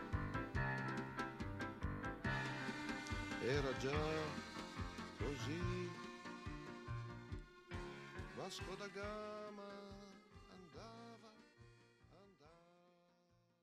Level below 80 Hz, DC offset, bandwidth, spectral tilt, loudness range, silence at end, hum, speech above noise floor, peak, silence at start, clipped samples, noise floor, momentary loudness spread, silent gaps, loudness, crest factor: -58 dBFS; under 0.1%; 14 kHz; -5.5 dB/octave; 15 LU; 0.75 s; none; 32 dB; -26 dBFS; 0 s; under 0.1%; -76 dBFS; 20 LU; none; -46 LUFS; 20 dB